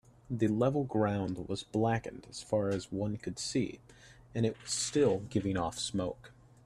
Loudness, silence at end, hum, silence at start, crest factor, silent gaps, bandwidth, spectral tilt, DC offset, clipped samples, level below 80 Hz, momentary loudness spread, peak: -33 LUFS; 0.35 s; none; 0.3 s; 18 dB; none; 13 kHz; -5.5 dB/octave; under 0.1%; under 0.1%; -60 dBFS; 11 LU; -16 dBFS